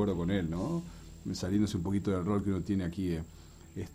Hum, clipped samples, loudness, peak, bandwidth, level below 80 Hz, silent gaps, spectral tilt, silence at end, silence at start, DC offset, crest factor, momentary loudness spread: none; under 0.1%; -33 LUFS; -18 dBFS; 16 kHz; -50 dBFS; none; -7 dB/octave; 0 s; 0 s; under 0.1%; 14 dB; 15 LU